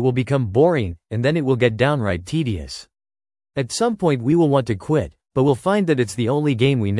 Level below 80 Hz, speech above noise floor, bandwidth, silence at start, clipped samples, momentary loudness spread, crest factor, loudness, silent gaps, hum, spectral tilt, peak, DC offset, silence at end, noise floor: -48 dBFS; over 71 dB; 12 kHz; 0 s; under 0.1%; 9 LU; 18 dB; -20 LUFS; none; none; -6.5 dB/octave; -2 dBFS; under 0.1%; 0 s; under -90 dBFS